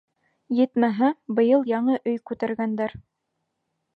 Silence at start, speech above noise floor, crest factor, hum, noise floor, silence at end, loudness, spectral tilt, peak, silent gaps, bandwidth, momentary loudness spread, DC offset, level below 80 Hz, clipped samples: 0.5 s; 56 dB; 16 dB; none; -78 dBFS; 0.95 s; -23 LUFS; -9 dB/octave; -8 dBFS; none; 4.9 kHz; 9 LU; under 0.1%; -64 dBFS; under 0.1%